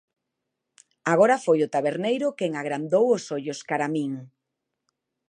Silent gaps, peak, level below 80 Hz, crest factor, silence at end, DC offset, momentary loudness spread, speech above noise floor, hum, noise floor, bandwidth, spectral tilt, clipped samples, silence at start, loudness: none; -6 dBFS; -80 dBFS; 20 dB; 1 s; under 0.1%; 12 LU; 59 dB; none; -82 dBFS; 10.5 kHz; -5.5 dB/octave; under 0.1%; 1.05 s; -24 LUFS